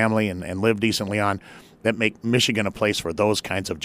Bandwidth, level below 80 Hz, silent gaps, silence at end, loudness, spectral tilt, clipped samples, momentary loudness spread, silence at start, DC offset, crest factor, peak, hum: 15.5 kHz; -54 dBFS; none; 0 s; -23 LUFS; -4.5 dB/octave; under 0.1%; 6 LU; 0 s; under 0.1%; 18 dB; -4 dBFS; none